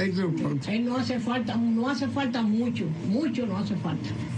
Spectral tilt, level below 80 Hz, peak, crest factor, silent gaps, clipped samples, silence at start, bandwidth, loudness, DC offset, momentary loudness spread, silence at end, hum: -7 dB/octave; -60 dBFS; -16 dBFS; 12 dB; none; under 0.1%; 0 s; 9.2 kHz; -27 LUFS; under 0.1%; 4 LU; 0 s; none